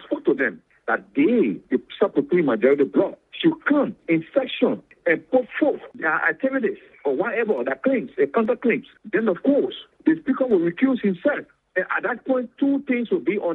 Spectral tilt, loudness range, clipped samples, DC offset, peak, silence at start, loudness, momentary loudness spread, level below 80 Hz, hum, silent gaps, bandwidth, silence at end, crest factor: -9 dB/octave; 2 LU; under 0.1%; under 0.1%; -4 dBFS; 0 s; -22 LUFS; 7 LU; -68 dBFS; none; none; 4.1 kHz; 0 s; 18 dB